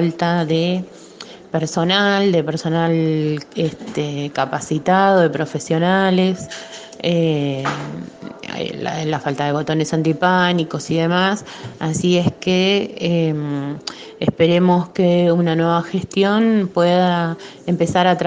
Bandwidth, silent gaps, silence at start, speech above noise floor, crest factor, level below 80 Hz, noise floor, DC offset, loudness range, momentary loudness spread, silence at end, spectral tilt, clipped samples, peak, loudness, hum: 9.4 kHz; none; 0 s; 21 dB; 18 dB; -56 dBFS; -38 dBFS; under 0.1%; 4 LU; 12 LU; 0 s; -6 dB/octave; under 0.1%; 0 dBFS; -18 LUFS; none